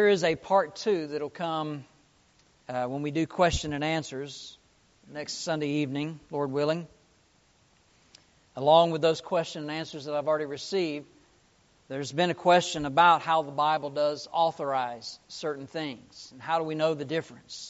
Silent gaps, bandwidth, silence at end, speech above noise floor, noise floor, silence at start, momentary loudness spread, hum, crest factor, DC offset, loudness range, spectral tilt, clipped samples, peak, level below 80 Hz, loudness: none; 8 kHz; 0 s; 37 dB; -64 dBFS; 0 s; 17 LU; none; 22 dB; under 0.1%; 7 LU; -3.5 dB/octave; under 0.1%; -8 dBFS; -56 dBFS; -28 LUFS